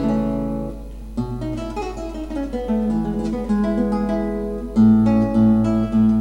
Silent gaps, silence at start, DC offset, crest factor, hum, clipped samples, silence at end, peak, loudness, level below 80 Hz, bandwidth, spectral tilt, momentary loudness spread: none; 0 s; 0.2%; 14 dB; none; under 0.1%; 0 s; -6 dBFS; -20 LUFS; -34 dBFS; 7.6 kHz; -9 dB/octave; 13 LU